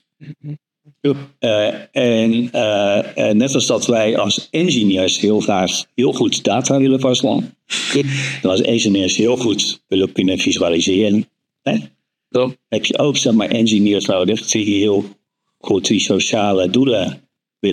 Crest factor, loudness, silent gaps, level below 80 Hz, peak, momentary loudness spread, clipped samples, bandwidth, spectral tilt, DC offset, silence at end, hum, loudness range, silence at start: 16 dB; -16 LUFS; none; -66 dBFS; 0 dBFS; 7 LU; under 0.1%; 13 kHz; -4 dB/octave; under 0.1%; 0 s; none; 2 LU; 0.2 s